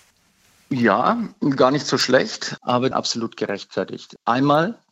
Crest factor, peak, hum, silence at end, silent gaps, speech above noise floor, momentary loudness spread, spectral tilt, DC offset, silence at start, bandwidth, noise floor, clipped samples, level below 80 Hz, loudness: 20 dB; -2 dBFS; none; 0.2 s; none; 39 dB; 10 LU; -4.5 dB/octave; under 0.1%; 0.7 s; 16 kHz; -59 dBFS; under 0.1%; -68 dBFS; -20 LUFS